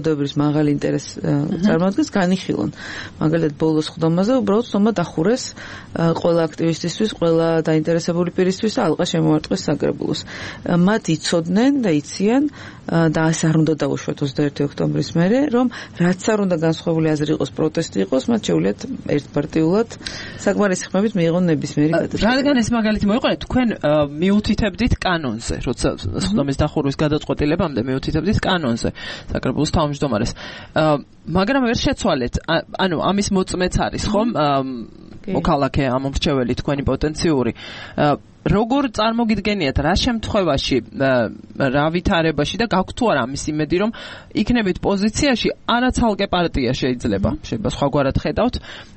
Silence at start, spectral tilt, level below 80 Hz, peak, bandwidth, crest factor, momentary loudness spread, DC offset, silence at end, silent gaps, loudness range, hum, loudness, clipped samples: 0 s; -6 dB/octave; -36 dBFS; -4 dBFS; 8.8 kHz; 14 dB; 6 LU; under 0.1%; 0.1 s; none; 2 LU; none; -19 LUFS; under 0.1%